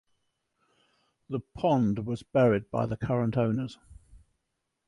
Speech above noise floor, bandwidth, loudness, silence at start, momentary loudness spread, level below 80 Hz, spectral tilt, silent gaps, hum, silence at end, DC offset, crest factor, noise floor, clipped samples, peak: 54 dB; 11 kHz; -28 LUFS; 1.3 s; 13 LU; -56 dBFS; -8.5 dB/octave; none; none; 0.7 s; under 0.1%; 18 dB; -81 dBFS; under 0.1%; -12 dBFS